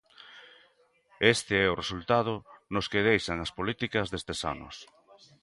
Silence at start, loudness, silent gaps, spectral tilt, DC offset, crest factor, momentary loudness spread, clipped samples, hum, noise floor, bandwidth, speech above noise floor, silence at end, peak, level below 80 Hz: 0.2 s; -28 LUFS; none; -4.5 dB/octave; under 0.1%; 22 dB; 15 LU; under 0.1%; none; -66 dBFS; 11.5 kHz; 37 dB; 0.6 s; -8 dBFS; -54 dBFS